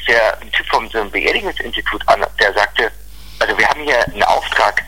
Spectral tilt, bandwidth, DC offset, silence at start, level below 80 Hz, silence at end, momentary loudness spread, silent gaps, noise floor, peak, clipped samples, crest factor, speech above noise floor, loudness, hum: -2.5 dB/octave; 17 kHz; 2%; 0 s; -36 dBFS; 0 s; 6 LU; none; -36 dBFS; 0 dBFS; under 0.1%; 16 dB; 20 dB; -15 LUFS; none